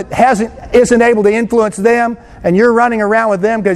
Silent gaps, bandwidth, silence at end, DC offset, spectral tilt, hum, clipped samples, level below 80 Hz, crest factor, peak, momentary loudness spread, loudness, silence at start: none; 12.5 kHz; 0 s; under 0.1%; -6 dB/octave; none; 0.1%; -40 dBFS; 12 dB; 0 dBFS; 5 LU; -11 LUFS; 0 s